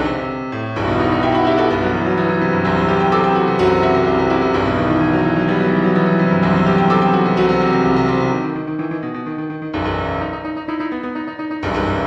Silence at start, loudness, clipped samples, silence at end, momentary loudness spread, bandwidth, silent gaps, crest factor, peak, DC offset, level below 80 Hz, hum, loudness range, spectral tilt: 0 s; -17 LUFS; under 0.1%; 0 s; 10 LU; 7.8 kHz; none; 14 dB; -2 dBFS; under 0.1%; -38 dBFS; none; 7 LU; -8 dB/octave